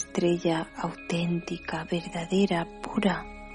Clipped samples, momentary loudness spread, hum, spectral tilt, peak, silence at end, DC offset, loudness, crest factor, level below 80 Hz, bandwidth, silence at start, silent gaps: under 0.1%; 8 LU; none; -6 dB/octave; -10 dBFS; 0 s; under 0.1%; -29 LUFS; 18 dB; -52 dBFS; 10.5 kHz; 0 s; none